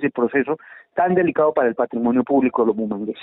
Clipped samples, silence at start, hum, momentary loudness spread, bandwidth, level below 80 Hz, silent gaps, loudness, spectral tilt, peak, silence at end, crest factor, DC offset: under 0.1%; 0 s; none; 8 LU; 4 kHz; -62 dBFS; none; -20 LUFS; -6.5 dB/octave; -6 dBFS; 0 s; 14 dB; under 0.1%